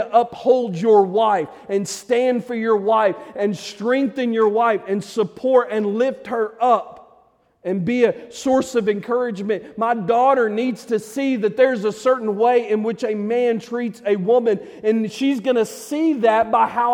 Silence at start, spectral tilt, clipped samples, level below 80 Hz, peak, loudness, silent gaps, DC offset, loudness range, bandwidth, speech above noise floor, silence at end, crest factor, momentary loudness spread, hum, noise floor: 0 s; -5.5 dB/octave; under 0.1%; -64 dBFS; -2 dBFS; -19 LUFS; none; under 0.1%; 2 LU; 15.5 kHz; 38 dB; 0 s; 16 dB; 8 LU; none; -57 dBFS